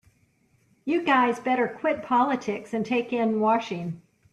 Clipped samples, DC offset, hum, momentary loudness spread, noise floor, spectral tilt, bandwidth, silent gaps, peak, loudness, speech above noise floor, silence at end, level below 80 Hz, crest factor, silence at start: under 0.1%; under 0.1%; none; 11 LU; -65 dBFS; -6 dB/octave; 11.5 kHz; none; -10 dBFS; -25 LUFS; 41 dB; 0.35 s; -70 dBFS; 16 dB; 0.85 s